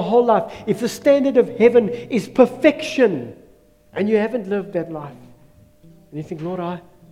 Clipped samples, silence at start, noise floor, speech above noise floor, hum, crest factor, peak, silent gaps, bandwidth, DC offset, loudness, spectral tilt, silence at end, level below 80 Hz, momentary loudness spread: under 0.1%; 0 s; -51 dBFS; 33 dB; none; 18 dB; 0 dBFS; none; 14.5 kHz; under 0.1%; -19 LUFS; -6 dB/octave; 0.3 s; -58 dBFS; 18 LU